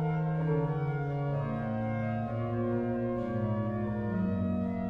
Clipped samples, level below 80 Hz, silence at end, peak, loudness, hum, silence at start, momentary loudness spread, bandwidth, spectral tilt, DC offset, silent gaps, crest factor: under 0.1%; -52 dBFS; 0 s; -18 dBFS; -32 LUFS; none; 0 s; 3 LU; 5 kHz; -11 dB/octave; under 0.1%; none; 12 dB